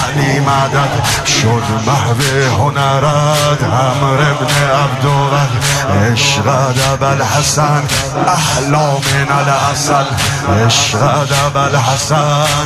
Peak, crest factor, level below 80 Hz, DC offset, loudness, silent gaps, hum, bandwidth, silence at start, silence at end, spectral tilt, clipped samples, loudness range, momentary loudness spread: 0 dBFS; 12 dB; -36 dBFS; under 0.1%; -12 LUFS; none; none; 15 kHz; 0 s; 0 s; -4 dB/octave; under 0.1%; 0 LU; 2 LU